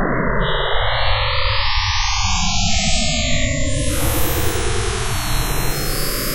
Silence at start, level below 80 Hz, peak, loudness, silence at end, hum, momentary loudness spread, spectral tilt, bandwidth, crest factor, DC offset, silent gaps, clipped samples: 0 s; -24 dBFS; -4 dBFS; -19 LUFS; 0 s; none; 4 LU; -3 dB/octave; 16 kHz; 14 dB; under 0.1%; none; under 0.1%